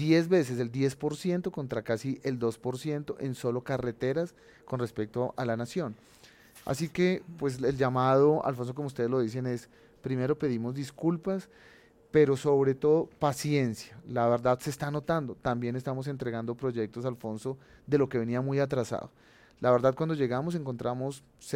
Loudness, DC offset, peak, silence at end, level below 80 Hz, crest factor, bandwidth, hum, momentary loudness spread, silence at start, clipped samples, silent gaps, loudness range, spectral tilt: -30 LUFS; under 0.1%; -12 dBFS; 0 s; -62 dBFS; 18 dB; 16.5 kHz; none; 11 LU; 0 s; under 0.1%; none; 5 LU; -7 dB/octave